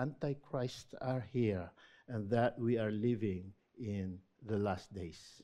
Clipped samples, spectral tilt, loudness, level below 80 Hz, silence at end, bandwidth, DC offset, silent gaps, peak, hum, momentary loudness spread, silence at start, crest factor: under 0.1%; -7.5 dB/octave; -38 LUFS; -68 dBFS; 0.05 s; 11.5 kHz; under 0.1%; none; -20 dBFS; none; 13 LU; 0 s; 18 dB